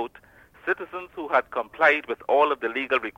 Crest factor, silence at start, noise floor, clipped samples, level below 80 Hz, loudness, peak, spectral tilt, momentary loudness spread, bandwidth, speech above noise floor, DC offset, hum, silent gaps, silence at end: 18 dB; 0 s; -53 dBFS; under 0.1%; -64 dBFS; -24 LUFS; -6 dBFS; -4.5 dB/octave; 14 LU; 16 kHz; 28 dB; under 0.1%; none; none; 0.1 s